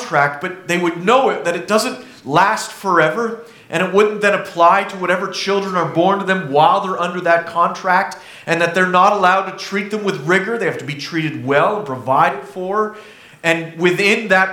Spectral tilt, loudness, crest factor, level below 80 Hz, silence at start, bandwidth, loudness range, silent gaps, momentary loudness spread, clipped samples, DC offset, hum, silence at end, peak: -4.5 dB/octave; -16 LUFS; 16 dB; -64 dBFS; 0 s; 18 kHz; 3 LU; none; 10 LU; under 0.1%; under 0.1%; none; 0 s; 0 dBFS